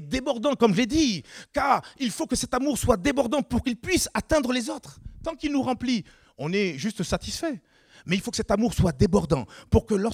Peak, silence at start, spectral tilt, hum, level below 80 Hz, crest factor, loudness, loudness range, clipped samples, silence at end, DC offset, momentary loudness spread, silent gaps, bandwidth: -6 dBFS; 0 s; -5 dB/octave; none; -42 dBFS; 20 dB; -25 LUFS; 4 LU; under 0.1%; 0 s; under 0.1%; 11 LU; none; 17.5 kHz